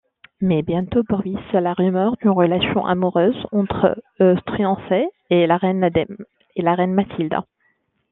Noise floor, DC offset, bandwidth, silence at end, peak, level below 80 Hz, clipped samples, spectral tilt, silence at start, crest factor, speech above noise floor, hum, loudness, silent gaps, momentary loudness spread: -66 dBFS; under 0.1%; 4 kHz; 0.7 s; -2 dBFS; -50 dBFS; under 0.1%; -10.5 dB/octave; 0.4 s; 16 dB; 47 dB; none; -19 LUFS; none; 6 LU